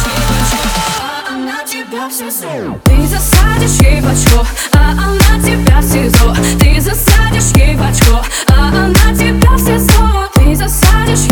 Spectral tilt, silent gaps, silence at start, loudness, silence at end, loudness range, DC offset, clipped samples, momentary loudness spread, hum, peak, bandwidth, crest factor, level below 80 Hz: -4.5 dB/octave; none; 0 s; -10 LUFS; 0 s; 4 LU; under 0.1%; 0.5%; 9 LU; none; 0 dBFS; over 20 kHz; 8 dB; -12 dBFS